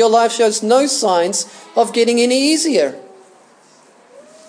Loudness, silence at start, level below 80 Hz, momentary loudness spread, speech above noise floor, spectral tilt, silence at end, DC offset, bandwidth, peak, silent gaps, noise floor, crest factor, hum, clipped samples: -15 LUFS; 0 s; -80 dBFS; 6 LU; 34 dB; -2.5 dB/octave; 1.45 s; under 0.1%; 10.5 kHz; 0 dBFS; none; -48 dBFS; 16 dB; none; under 0.1%